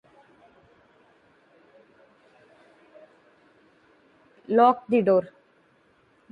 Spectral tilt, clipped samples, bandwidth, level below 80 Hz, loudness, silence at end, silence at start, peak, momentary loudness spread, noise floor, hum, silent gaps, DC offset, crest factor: -8.5 dB/octave; under 0.1%; 9 kHz; -76 dBFS; -22 LUFS; 1.05 s; 4.5 s; -6 dBFS; 6 LU; -62 dBFS; none; none; under 0.1%; 24 dB